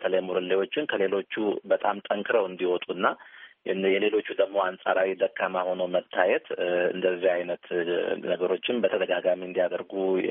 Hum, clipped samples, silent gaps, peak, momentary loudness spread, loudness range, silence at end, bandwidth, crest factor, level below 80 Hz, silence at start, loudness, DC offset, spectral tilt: none; under 0.1%; none; -8 dBFS; 4 LU; 1 LU; 0 s; 3.8 kHz; 18 dB; -76 dBFS; 0 s; -27 LUFS; under 0.1%; -2.5 dB/octave